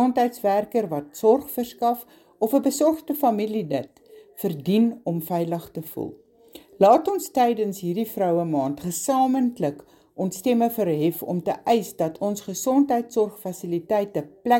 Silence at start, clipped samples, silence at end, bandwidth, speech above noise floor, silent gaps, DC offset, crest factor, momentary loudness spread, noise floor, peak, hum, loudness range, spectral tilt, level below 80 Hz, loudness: 0 s; under 0.1%; 0 s; 17 kHz; 26 dB; none; under 0.1%; 20 dB; 10 LU; -49 dBFS; -4 dBFS; none; 2 LU; -6 dB/octave; -66 dBFS; -23 LUFS